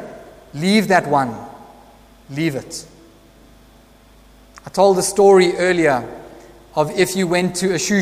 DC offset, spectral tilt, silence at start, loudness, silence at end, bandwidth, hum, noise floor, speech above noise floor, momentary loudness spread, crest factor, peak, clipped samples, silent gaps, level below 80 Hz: under 0.1%; -4.5 dB/octave; 0 s; -17 LUFS; 0 s; 15.5 kHz; none; -48 dBFS; 32 dB; 21 LU; 18 dB; 0 dBFS; under 0.1%; none; -50 dBFS